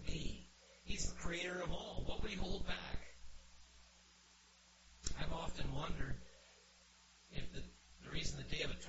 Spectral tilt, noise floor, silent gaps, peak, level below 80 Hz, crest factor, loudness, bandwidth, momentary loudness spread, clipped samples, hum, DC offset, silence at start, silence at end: -3.5 dB/octave; -67 dBFS; none; -22 dBFS; -50 dBFS; 20 dB; -46 LUFS; 8 kHz; 21 LU; under 0.1%; none; under 0.1%; 0 s; 0 s